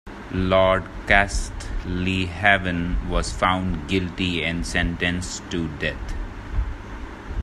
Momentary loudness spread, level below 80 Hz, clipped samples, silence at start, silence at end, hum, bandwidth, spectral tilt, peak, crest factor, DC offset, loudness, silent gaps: 14 LU; -32 dBFS; under 0.1%; 0.05 s; 0 s; none; 12.5 kHz; -5 dB/octave; 0 dBFS; 22 dB; under 0.1%; -23 LUFS; none